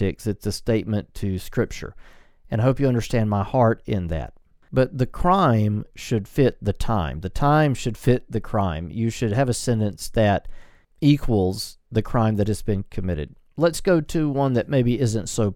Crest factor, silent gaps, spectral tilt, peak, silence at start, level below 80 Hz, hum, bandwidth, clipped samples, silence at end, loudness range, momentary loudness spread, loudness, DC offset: 18 dB; none; -6.5 dB/octave; -4 dBFS; 0 s; -36 dBFS; none; 15.5 kHz; under 0.1%; 0 s; 2 LU; 9 LU; -23 LUFS; under 0.1%